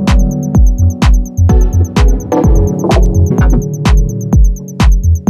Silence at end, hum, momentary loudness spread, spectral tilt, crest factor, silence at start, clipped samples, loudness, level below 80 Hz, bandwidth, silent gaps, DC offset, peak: 0 s; none; 2 LU; -7 dB/octave; 8 dB; 0 s; under 0.1%; -11 LUFS; -10 dBFS; 13.5 kHz; none; under 0.1%; 0 dBFS